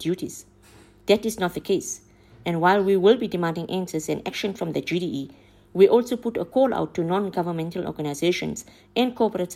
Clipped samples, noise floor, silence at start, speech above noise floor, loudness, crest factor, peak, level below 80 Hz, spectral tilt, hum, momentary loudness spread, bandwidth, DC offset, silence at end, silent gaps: under 0.1%; -52 dBFS; 0 s; 29 dB; -24 LUFS; 18 dB; -4 dBFS; -58 dBFS; -5 dB/octave; 50 Hz at -55 dBFS; 15 LU; 16 kHz; under 0.1%; 0 s; none